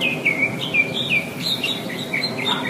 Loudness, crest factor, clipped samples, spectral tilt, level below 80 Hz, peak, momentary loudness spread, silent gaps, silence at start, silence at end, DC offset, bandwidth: -20 LUFS; 16 dB; under 0.1%; -3.5 dB/octave; -62 dBFS; -6 dBFS; 5 LU; none; 0 s; 0 s; under 0.1%; 15.5 kHz